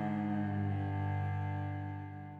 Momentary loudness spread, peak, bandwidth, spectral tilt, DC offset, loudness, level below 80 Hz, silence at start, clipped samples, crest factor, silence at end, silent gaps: 6 LU; -24 dBFS; 4.1 kHz; -10 dB/octave; under 0.1%; -37 LUFS; -70 dBFS; 0 s; under 0.1%; 12 dB; 0 s; none